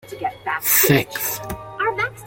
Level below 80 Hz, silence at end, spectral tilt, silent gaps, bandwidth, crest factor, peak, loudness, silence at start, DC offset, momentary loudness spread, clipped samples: -48 dBFS; 0 s; -3.5 dB/octave; none; 17 kHz; 20 dB; -2 dBFS; -19 LUFS; 0.05 s; under 0.1%; 15 LU; under 0.1%